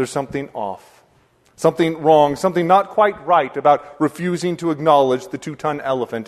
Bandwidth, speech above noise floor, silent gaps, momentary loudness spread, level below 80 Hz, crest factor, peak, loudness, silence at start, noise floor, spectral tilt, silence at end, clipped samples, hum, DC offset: 13.5 kHz; 39 dB; none; 12 LU; -58 dBFS; 18 dB; 0 dBFS; -18 LUFS; 0 s; -57 dBFS; -6 dB/octave; 0.05 s; under 0.1%; none; under 0.1%